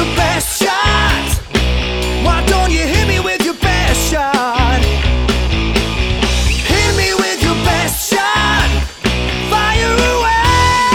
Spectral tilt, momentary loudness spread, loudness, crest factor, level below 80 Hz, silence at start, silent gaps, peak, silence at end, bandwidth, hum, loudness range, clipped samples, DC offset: -4 dB/octave; 4 LU; -13 LUFS; 12 dB; -18 dBFS; 0 s; none; 0 dBFS; 0 s; 18 kHz; none; 1 LU; under 0.1%; under 0.1%